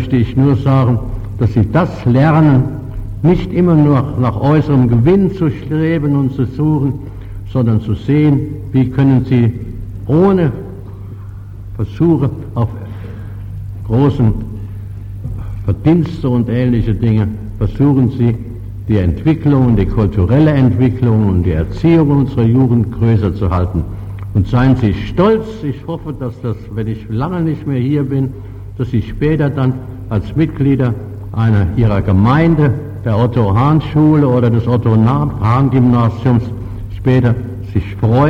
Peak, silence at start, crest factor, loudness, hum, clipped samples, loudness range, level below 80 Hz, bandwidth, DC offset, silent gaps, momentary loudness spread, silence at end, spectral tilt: -2 dBFS; 0 s; 10 dB; -14 LUFS; none; under 0.1%; 5 LU; -30 dBFS; 5.6 kHz; under 0.1%; none; 15 LU; 0 s; -10 dB/octave